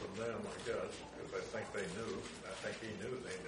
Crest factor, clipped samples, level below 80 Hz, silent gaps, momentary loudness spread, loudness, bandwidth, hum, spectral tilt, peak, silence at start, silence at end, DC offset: 14 dB; under 0.1%; -66 dBFS; none; 4 LU; -44 LUFS; 10.5 kHz; none; -4 dB/octave; -30 dBFS; 0 s; 0 s; under 0.1%